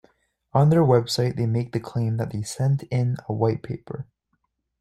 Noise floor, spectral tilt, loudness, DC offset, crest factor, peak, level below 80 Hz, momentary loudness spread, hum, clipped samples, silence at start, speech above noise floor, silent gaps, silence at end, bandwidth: -74 dBFS; -7 dB/octave; -23 LUFS; under 0.1%; 18 dB; -4 dBFS; -56 dBFS; 15 LU; none; under 0.1%; 0.55 s; 52 dB; none; 0.8 s; 13 kHz